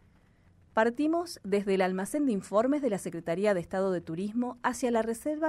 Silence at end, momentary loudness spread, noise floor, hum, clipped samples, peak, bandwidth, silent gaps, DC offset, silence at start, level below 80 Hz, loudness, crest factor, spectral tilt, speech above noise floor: 0 s; 6 LU; -62 dBFS; none; under 0.1%; -12 dBFS; 15.5 kHz; none; under 0.1%; 0.75 s; -64 dBFS; -30 LUFS; 18 dB; -5.5 dB/octave; 33 dB